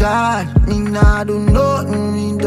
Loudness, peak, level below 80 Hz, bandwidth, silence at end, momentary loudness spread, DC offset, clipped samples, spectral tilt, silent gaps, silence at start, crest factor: -15 LUFS; 0 dBFS; -20 dBFS; 13.5 kHz; 0 s; 5 LU; under 0.1%; under 0.1%; -7 dB/octave; none; 0 s; 14 dB